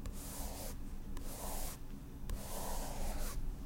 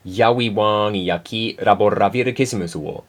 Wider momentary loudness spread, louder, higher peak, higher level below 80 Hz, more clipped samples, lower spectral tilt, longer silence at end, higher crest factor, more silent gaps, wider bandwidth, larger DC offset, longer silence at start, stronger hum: about the same, 6 LU vs 7 LU; second, -45 LUFS vs -19 LUFS; second, -22 dBFS vs 0 dBFS; first, -42 dBFS vs -54 dBFS; neither; second, -4 dB/octave vs -5.5 dB/octave; about the same, 0 s vs 0.1 s; about the same, 18 dB vs 18 dB; neither; about the same, 16.5 kHz vs 16 kHz; neither; about the same, 0 s vs 0.05 s; neither